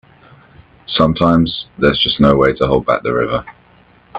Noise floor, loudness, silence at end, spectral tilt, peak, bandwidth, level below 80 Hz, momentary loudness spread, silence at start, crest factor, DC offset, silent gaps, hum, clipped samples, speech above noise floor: -48 dBFS; -14 LUFS; 0 s; -8 dB/octave; 0 dBFS; 8 kHz; -36 dBFS; 8 LU; 0.9 s; 16 dB; under 0.1%; none; none; under 0.1%; 34 dB